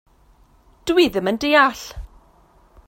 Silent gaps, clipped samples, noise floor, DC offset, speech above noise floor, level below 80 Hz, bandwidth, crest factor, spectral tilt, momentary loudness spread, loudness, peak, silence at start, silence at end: none; under 0.1%; -54 dBFS; under 0.1%; 36 dB; -44 dBFS; 16.5 kHz; 20 dB; -4 dB/octave; 20 LU; -17 LUFS; -2 dBFS; 0.85 s; 0.8 s